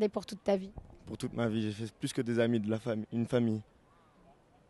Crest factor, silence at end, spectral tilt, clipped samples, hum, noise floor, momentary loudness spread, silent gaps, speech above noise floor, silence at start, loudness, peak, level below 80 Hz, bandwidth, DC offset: 16 dB; 1.1 s; -6.5 dB/octave; under 0.1%; none; -64 dBFS; 10 LU; none; 31 dB; 0 s; -34 LUFS; -18 dBFS; -62 dBFS; 12.5 kHz; under 0.1%